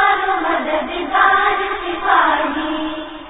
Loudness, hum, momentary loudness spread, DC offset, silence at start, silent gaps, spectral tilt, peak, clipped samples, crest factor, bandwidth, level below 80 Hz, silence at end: -16 LUFS; none; 8 LU; under 0.1%; 0 s; none; -8 dB/octave; 0 dBFS; under 0.1%; 16 dB; 4 kHz; -46 dBFS; 0 s